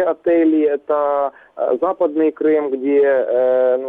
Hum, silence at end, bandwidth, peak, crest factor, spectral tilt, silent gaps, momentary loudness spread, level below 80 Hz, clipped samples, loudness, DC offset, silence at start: none; 0 s; 3.9 kHz; -8 dBFS; 8 dB; -8.5 dB/octave; none; 6 LU; -64 dBFS; under 0.1%; -17 LUFS; under 0.1%; 0 s